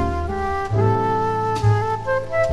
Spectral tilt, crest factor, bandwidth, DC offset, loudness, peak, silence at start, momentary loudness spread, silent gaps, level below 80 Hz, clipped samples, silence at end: -7.5 dB/octave; 14 dB; 11 kHz; under 0.1%; -21 LUFS; -6 dBFS; 0 s; 5 LU; none; -34 dBFS; under 0.1%; 0 s